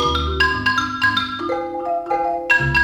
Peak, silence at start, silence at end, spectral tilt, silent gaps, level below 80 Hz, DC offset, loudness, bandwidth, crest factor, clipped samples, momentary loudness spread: -4 dBFS; 0 s; 0 s; -4.5 dB/octave; none; -34 dBFS; under 0.1%; -19 LUFS; 14.5 kHz; 14 dB; under 0.1%; 7 LU